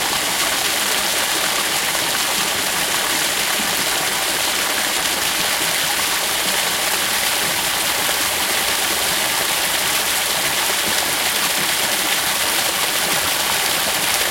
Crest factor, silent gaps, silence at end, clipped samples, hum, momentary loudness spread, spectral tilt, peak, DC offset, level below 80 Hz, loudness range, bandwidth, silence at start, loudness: 18 dB; none; 0 s; under 0.1%; none; 1 LU; 0 dB/octave; 0 dBFS; under 0.1%; -50 dBFS; 1 LU; 16.5 kHz; 0 s; -17 LUFS